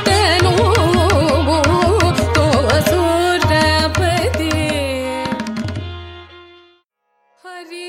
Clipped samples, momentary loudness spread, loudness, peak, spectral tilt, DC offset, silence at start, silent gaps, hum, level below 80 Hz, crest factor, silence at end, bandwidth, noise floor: under 0.1%; 14 LU; -15 LUFS; -2 dBFS; -5 dB/octave; under 0.1%; 0 s; none; none; -30 dBFS; 14 dB; 0 s; 16 kHz; -64 dBFS